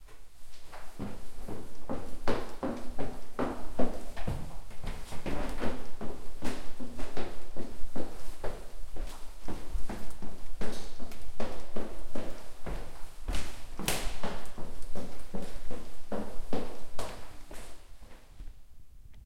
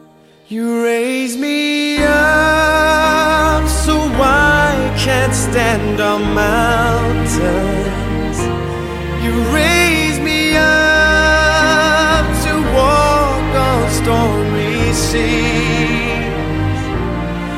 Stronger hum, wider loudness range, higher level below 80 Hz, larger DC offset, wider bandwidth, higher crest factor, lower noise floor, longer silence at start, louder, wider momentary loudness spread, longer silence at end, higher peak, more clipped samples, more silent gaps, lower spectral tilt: neither; about the same, 6 LU vs 4 LU; second, -42 dBFS vs -24 dBFS; neither; about the same, 15.5 kHz vs 16.5 kHz; about the same, 16 dB vs 14 dB; about the same, -47 dBFS vs -45 dBFS; second, 0 s vs 0.5 s; second, -41 LUFS vs -13 LUFS; first, 14 LU vs 8 LU; about the same, 0.05 s vs 0 s; second, -10 dBFS vs 0 dBFS; neither; neither; about the same, -5 dB/octave vs -4.5 dB/octave